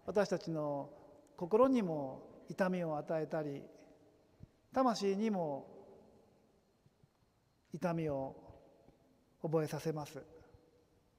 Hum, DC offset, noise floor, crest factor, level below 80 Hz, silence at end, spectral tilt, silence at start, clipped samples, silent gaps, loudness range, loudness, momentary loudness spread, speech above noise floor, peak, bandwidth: none; under 0.1%; -74 dBFS; 22 dB; -74 dBFS; 0.8 s; -6.5 dB/octave; 0.05 s; under 0.1%; none; 8 LU; -37 LUFS; 20 LU; 38 dB; -18 dBFS; 15.5 kHz